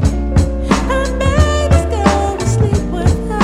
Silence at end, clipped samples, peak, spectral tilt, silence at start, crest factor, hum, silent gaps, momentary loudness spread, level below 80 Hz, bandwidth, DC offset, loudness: 0 s; under 0.1%; 0 dBFS; -6 dB/octave; 0 s; 14 dB; none; none; 3 LU; -18 dBFS; 12.5 kHz; under 0.1%; -15 LUFS